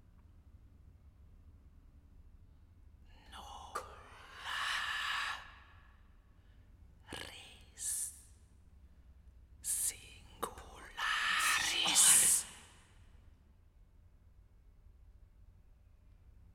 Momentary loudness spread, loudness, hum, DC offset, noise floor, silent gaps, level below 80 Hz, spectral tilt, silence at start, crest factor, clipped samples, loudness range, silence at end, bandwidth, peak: 28 LU; -32 LUFS; none; under 0.1%; -63 dBFS; none; -62 dBFS; 1 dB/octave; 0.65 s; 28 dB; under 0.1%; 15 LU; 1.45 s; 16.5 kHz; -12 dBFS